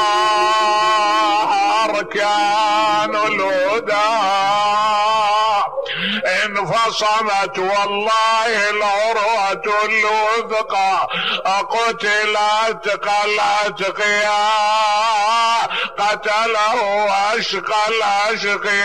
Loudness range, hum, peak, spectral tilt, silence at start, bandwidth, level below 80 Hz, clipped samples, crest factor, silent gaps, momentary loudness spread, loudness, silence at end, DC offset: 1 LU; none; -6 dBFS; -2 dB/octave; 0 s; 13.5 kHz; -60 dBFS; under 0.1%; 10 dB; none; 4 LU; -16 LUFS; 0 s; 0.5%